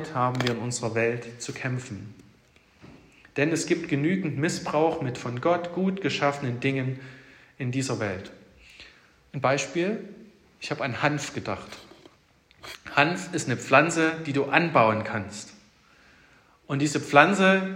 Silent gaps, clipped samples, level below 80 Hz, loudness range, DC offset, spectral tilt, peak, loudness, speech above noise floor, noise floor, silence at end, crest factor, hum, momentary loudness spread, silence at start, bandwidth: none; under 0.1%; -64 dBFS; 7 LU; under 0.1%; -5 dB/octave; -2 dBFS; -25 LUFS; 35 dB; -60 dBFS; 0 s; 26 dB; none; 19 LU; 0 s; 15.5 kHz